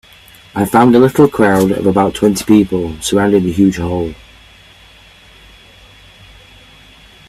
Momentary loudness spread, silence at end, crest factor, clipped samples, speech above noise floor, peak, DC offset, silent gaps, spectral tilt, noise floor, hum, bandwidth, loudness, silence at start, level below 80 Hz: 10 LU; 3.15 s; 14 dB; under 0.1%; 31 dB; 0 dBFS; under 0.1%; none; -6 dB/octave; -42 dBFS; none; 14.5 kHz; -12 LUFS; 0.55 s; -42 dBFS